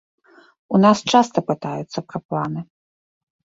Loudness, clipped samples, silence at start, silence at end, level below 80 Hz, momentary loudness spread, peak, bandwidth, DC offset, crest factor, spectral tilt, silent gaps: -20 LUFS; under 0.1%; 0.7 s; 0.8 s; -62 dBFS; 14 LU; -2 dBFS; 8 kHz; under 0.1%; 20 dB; -5.5 dB/octave; 2.25-2.29 s